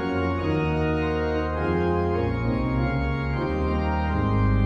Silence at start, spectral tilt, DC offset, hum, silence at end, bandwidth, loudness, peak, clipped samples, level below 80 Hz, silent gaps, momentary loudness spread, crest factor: 0 s; -9 dB/octave; under 0.1%; none; 0 s; 6.8 kHz; -25 LUFS; -12 dBFS; under 0.1%; -32 dBFS; none; 2 LU; 12 dB